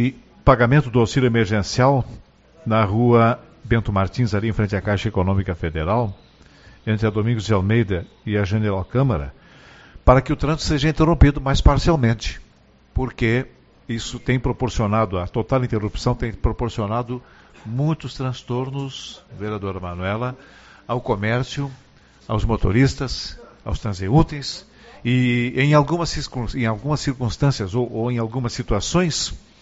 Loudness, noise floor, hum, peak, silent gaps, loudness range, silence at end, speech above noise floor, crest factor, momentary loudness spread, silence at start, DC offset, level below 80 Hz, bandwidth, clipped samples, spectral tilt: -21 LUFS; -53 dBFS; none; 0 dBFS; none; 7 LU; 0.2 s; 33 dB; 20 dB; 13 LU; 0 s; under 0.1%; -30 dBFS; 8 kHz; under 0.1%; -6 dB/octave